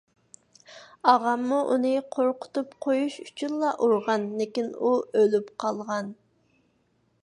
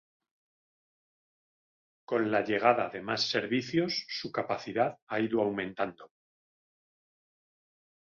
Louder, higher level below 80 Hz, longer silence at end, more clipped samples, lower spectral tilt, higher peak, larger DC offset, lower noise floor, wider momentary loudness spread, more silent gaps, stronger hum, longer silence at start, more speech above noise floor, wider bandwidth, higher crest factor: first, -26 LUFS vs -31 LUFS; second, -78 dBFS vs -72 dBFS; second, 1.1 s vs 2.15 s; neither; about the same, -5.5 dB/octave vs -5 dB/octave; first, -4 dBFS vs -10 dBFS; neither; second, -69 dBFS vs under -90 dBFS; about the same, 10 LU vs 8 LU; second, none vs 5.02-5.07 s; neither; second, 0.7 s vs 2.1 s; second, 44 dB vs over 60 dB; first, 11 kHz vs 7.2 kHz; about the same, 22 dB vs 24 dB